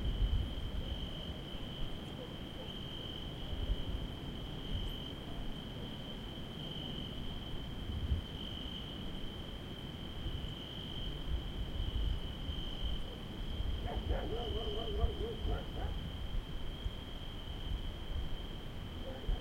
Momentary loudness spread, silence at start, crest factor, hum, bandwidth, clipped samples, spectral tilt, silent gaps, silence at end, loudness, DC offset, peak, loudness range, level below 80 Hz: 6 LU; 0 s; 20 dB; none; 16.5 kHz; under 0.1%; -6 dB/octave; none; 0 s; -42 LUFS; under 0.1%; -20 dBFS; 3 LU; -42 dBFS